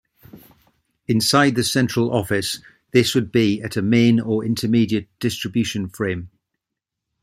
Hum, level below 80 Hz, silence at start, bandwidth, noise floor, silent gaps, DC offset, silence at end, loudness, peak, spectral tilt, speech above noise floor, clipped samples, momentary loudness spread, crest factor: none; -56 dBFS; 0.35 s; 15.5 kHz; -83 dBFS; none; under 0.1%; 0.95 s; -20 LUFS; -2 dBFS; -5 dB/octave; 64 dB; under 0.1%; 10 LU; 20 dB